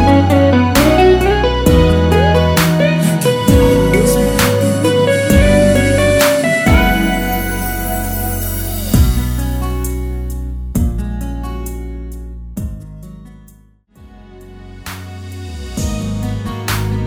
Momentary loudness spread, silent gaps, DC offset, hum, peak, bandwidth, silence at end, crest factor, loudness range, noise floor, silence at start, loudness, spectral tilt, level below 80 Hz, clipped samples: 17 LU; none; under 0.1%; none; 0 dBFS; over 20 kHz; 0 s; 14 dB; 18 LU; -46 dBFS; 0 s; -13 LUFS; -5.5 dB/octave; -22 dBFS; under 0.1%